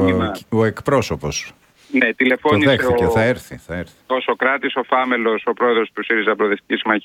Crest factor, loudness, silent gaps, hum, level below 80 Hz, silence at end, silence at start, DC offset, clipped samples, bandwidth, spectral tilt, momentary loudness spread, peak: 18 dB; -18 LUFS; none; none; -46 dBFS; 0.05 s; 0 s; under 0.1%; under 0.1%; 16 kHz; -5.5 dB/octave; 11 LU; 0 dBFS